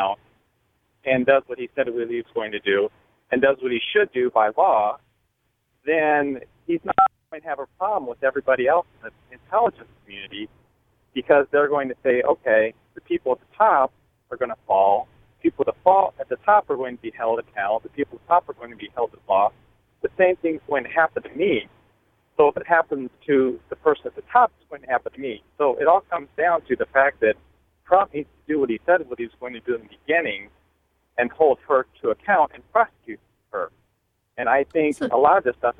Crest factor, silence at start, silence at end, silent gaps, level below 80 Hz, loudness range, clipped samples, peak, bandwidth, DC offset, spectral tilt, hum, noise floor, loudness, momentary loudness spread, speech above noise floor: 22 dB; 0 s; 0.05 s; none; -60 dBFS; 3 LU; under 0.1%; -2 dBFS; 10 kHz; under 0.1%; -6.5 dB/octave; none; -71 dBFS; -22 LUFS; 14 LU; 50 dB